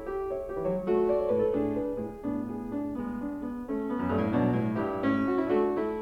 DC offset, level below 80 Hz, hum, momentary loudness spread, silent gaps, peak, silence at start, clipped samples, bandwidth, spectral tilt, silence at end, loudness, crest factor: under 0.1%; -52 dBFS; none; 8 LU; none; -14 dBFS; 0 s; under 0.1%; 8 kHz; -9 dB/octave; 0 s; -30 LUFS; 14 dB